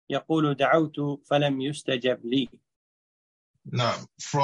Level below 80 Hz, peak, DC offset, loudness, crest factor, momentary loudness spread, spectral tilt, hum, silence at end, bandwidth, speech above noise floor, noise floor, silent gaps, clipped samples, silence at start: -68 dBFS; -8 dBFS; under 0.1%; -26 LUFS; 18 dB; 9 LU; -5.5 dB/octave; none; 0 s; 11 kHz; over 64 dB; under -90 dBFS; 2.76-3.54 s; under 0.1%; 0.1 s